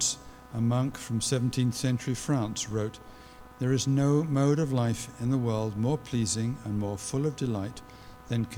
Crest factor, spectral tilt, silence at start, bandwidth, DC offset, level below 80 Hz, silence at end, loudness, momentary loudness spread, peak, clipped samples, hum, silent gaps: 16 dB; -5.5 dB/octave; 0 s; 16.5 kHz; under 0.1%; -54 dBFS; 0 s; -29 LUFS; 12 LU; -14 dBFS; under 0.1%; none; none